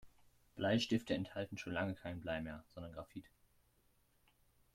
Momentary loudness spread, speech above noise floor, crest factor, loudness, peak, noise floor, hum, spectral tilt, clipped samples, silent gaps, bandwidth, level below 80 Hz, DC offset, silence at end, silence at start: 16 LU; 34 dB; 20 dB; -41 LUFS; -24 dBFS; -75 dBFS; none; -5.5 dB/octave; under 0.1%; none; 15.5 kHz; -68 dBFS; under 0.1%; 1.45 s; 0.05 s